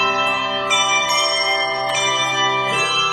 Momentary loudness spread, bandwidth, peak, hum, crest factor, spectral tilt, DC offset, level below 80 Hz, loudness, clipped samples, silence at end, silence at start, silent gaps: 3 LU; 16 kHz; -4 dBFS; none; 14 dB; -1 dB/octave; under 0.1%; -56 dBFS; -17 LUFS; under 0.1%; 0 s; 0 s; none